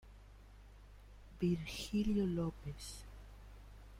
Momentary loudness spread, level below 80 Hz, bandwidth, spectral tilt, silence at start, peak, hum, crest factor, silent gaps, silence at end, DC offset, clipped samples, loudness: 25 LU; -54 dBFS; 16 kHz; -6.5 dB/octave; 0.05 s; -24 dBFS; none; 16 dB; none; 0 s; under 0.1%; under 0.1%; -39 LUFS